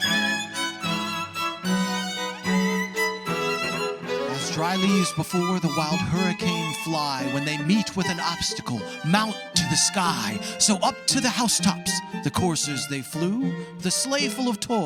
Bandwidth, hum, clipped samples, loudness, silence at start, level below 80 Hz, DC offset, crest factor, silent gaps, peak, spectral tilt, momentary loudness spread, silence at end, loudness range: 17.5 kHz; none; under 0.1%; -24 LUFS; 0 s; -58 dBFS; under 0.1%; 20 dB; none; -4 dBFS; -3.5 dB/octave; 7 LU; 0 s; 3 LU